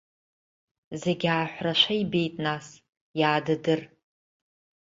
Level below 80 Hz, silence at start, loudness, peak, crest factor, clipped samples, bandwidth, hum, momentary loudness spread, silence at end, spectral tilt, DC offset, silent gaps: -68 dBFS; 0.9 s; -26 LUFS; -8 dBFS; 20 dB; under 0.1%; 7.8 kHz; none; 10 LU; 1.1 s; -5.5 dB/octave; under 0.1%; 2.89-3.14 s